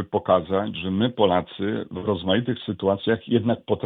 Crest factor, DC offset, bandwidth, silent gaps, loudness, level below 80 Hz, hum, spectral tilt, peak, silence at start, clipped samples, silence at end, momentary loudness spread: 18 dB; under 0.1%; 4.2 kHz; none; -23 LUFS; -56 dBFS; none; -10 dB/octave; -6 dBFS; 0 s; under 0.1%; 0 s; 7 LU